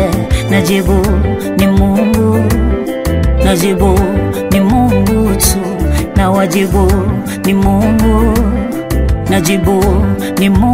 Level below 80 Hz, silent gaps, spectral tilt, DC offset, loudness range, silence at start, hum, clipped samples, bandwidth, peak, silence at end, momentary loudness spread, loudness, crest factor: -18 dBFS; none; -6 dB/octave; under 0.1%; 1 LU; 0 s; none; under 0.1%; 16.5 kHz; 0 dBFS; 0 s; 5 LU; -12 LUFS; 10 dB